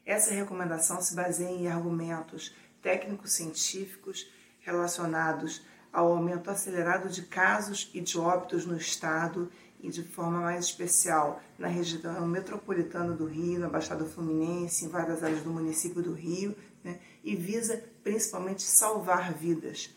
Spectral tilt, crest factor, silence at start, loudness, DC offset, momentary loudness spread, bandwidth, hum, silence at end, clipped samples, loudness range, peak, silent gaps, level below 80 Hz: -3.5 dB/octave; 26 dB; 0.05 s; -30 LUFS; under 0.1%; 13 LU; 16.5 kHz; none; 0.05 s; under 0.1%; 4 LU; -6 dBFS; none; -72 dBFS